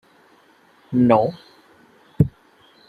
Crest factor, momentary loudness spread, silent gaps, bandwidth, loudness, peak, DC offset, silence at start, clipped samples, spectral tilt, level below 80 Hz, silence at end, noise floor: 22 dB; 9 LU; none; 4.9 kHz; -20 LUFS; -2 dBFS; under 0.1%; 0.9 s; under 0.1%; -10 dB/octave; -50 dBFS; 0.6 s; -55 dBFS